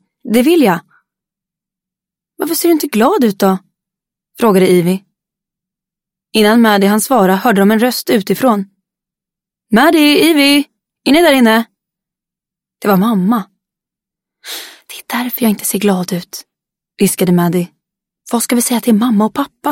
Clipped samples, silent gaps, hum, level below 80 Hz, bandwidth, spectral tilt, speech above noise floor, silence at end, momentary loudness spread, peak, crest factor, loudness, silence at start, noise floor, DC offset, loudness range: under 0.1%; none; none; -56 dBFS; 17 kHz; -4.5 dB/octave; 74 dB; 0 s; 13 LU; 0 dBFS; 14 dB; -12 LUFS; 0.25 s; -85 dBFS; under 0.1%; 7 LU